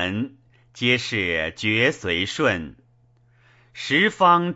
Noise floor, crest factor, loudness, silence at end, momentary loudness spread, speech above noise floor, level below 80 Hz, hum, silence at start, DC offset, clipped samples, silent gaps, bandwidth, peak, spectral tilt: -58 dBFS; 20 dB; -21 LUFS; 0 s; 13 LU; 37 dB; -54 dBFS; none; 0 s; under 0.1%; under 0.1%; none; 8 kHz; -4 dBFS; -4.5 dB/octave